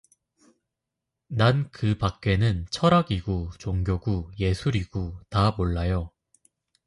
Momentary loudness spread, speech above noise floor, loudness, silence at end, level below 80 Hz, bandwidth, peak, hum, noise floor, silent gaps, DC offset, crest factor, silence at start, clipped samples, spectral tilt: 9 LU; 60 dB; -26 LUFS; 0.8 s; -38 dBFS; 11.5 kHz; -6 dBFS; none; -85 dBFS; none; under 0.1%; 20 dB; 1.3 s; under 0.1%; -7 dB/octave